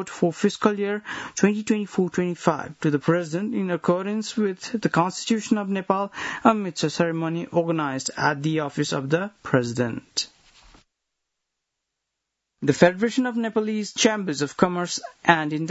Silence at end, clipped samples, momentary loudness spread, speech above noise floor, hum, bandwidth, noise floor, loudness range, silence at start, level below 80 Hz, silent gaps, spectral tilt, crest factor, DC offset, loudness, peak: 0 s; under 0.1%; 6 LU; 59 dB; none; 8.2 kHz; -82 dBFS; 4 LU; 0 s; -64 dBFS; none; -5 dB/octave; 24 dB; under 0.1%; -24 LUFS; 0 dBFS